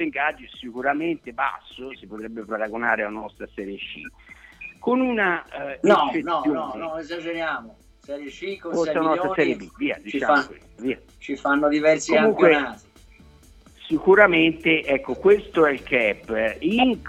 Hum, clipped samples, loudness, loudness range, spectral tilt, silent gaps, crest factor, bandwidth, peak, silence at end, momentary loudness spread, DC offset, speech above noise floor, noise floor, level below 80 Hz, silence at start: none; under 0.1%; -22 LUFS; 8 LU; -5 dB/octave; none; 22 dB; 10.5 kHz; 0 dBFS; 0 s; 18 LU; under 0.1%; 28 dB; -50 dBFS; -54 dBFS; 0 s